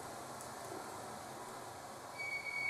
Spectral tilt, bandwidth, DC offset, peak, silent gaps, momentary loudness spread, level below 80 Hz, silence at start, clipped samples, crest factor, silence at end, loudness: -2.5 dB/octave; 15.5 kHz; under 0.1%; -28 dBFS; none; 8 LU; -76 dBFS; 0 s; under 0.1%; 18 dB; 0 s; -45 LUFS